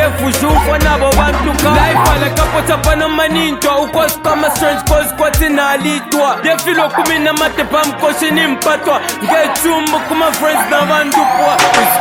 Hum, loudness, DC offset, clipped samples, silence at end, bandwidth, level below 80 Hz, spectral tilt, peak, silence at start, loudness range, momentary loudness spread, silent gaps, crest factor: none; -12 LUFS; under 0.1%; under 0.1%; 0 s; 19.5 kHz; -22 dBFS; -4 dB/octave; 0 dBFS; 0 s; 1 LU; 3 LU; none; 12 dB